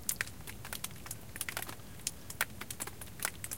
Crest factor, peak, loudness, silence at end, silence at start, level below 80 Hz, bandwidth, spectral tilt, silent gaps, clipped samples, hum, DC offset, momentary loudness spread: 32 dB; -10 dBFS; -40 LUFS; 0 s; 0 s; -58 dBFS; 17 kHz; -1.5 dB/octave; none; under 0.1%; none; 0.3%; 7 LU